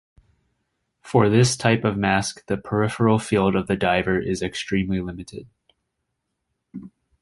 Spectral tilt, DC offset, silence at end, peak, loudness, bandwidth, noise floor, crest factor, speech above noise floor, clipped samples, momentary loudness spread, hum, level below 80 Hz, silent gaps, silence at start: -5.5 dB/octave; under 0.1%; 0.35 s; -2 dBFS; -21 LUFS; 11.5 kHz; -78 dBFS; 20 dB; 57 dB; under 0.1%; 21 LU; none; -48 dBFS; none; 1.05 s